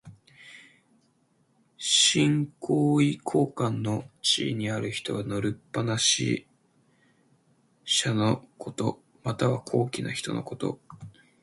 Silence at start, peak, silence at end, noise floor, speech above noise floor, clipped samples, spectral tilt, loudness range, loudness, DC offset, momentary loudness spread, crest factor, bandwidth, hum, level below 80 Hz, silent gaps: 0.05 s; -8 dBFS; 0.35 s; -68 dBFS; 41 dB; under 0.1%; -4 dB/octave; 5 LU; -26 LUFS; under 0.1%; 11 LU; 20 dB; 11.5 kHz; none; -62 dBFS; none